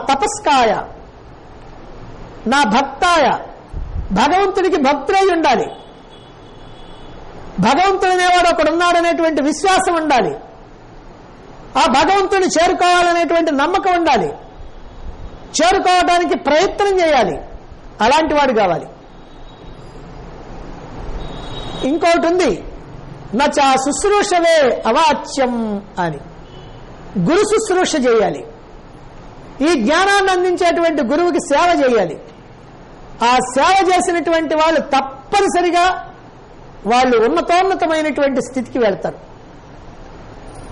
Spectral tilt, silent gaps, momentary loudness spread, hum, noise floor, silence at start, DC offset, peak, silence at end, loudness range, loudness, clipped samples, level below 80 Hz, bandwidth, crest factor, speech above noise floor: -4 dB/octave; none; 19 LU; none; -38 dBFS; 0 s; under 0.1%; -4 dBFS; 0 s; 4 LU; -15 LUFS; under 0.1%; -38 dBFS; 11.5 kHz; 12 dB; 25 dB